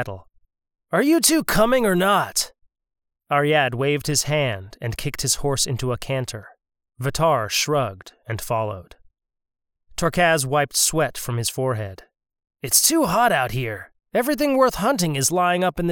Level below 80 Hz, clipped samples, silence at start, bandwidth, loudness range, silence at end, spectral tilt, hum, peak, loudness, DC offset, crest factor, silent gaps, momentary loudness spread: -46 dBFS; under 0.1%; 0 s; over 20 kHz; 5 LU; 0 s; -3.5 dB/octave; none; -2 dBFS; -20 LUFS; under 0.1%; 20 dB; none; 13 LU